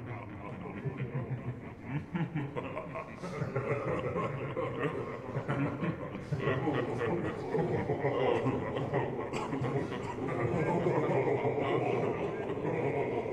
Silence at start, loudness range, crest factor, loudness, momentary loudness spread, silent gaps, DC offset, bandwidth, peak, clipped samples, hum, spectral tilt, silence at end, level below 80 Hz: 0 s; 5 LU; 16 dB; -34 LUFS; 10 LU; none; under 0.1%; 10 kHz; -16 dBFS; under 0.1%; none; -8 dB/octave; 0 s; -58 dBFS